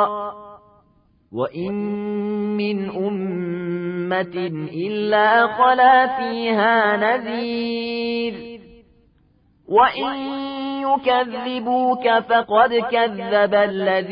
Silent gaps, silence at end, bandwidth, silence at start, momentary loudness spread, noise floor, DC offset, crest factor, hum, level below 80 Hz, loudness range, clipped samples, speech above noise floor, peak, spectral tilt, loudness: none; 0 s; 5.2 kHz; 0 s; 11 LU; -58 dBFS; under 0.1%; 16 dB; none; -60 dBFS; 7 LU; under 0.1%; 39 dB; -4 dBFS; -10 dB/octave; -19 LUFS